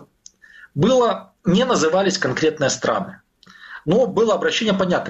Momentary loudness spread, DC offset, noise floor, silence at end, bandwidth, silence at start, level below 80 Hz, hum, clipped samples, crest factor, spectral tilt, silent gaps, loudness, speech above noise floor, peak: 9 LU; under 0.1%; -49 dBFS; 0 s; 8.2 kHz; 0.75 s; -52 dBFS; none; under 0.1%; 16 dB; -4.5 dB/octave; none; -19 LUFS; 31 dB; -4 dBFS